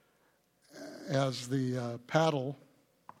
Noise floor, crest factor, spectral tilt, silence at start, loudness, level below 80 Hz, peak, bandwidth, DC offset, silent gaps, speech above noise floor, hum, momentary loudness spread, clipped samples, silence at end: -71 dBFS; 22 dB; -6 dB/octave; 0.75 s; -33 LUFS; -78 dBFS; -12 dBFS; 15 kHz; under 0.1%; none; 39 dB; none; 19 LU; under 0.1%; 0.65 s